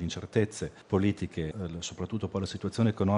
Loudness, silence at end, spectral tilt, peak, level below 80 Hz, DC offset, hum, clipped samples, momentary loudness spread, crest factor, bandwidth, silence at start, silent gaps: -32 LUFS; 0 s; -6.5 dB/octave; -12 dBFS; -54 dBFS; under 0.1%; none; under 0.1%; 8 LU; 18 dB; 11 kHz; 0 s; none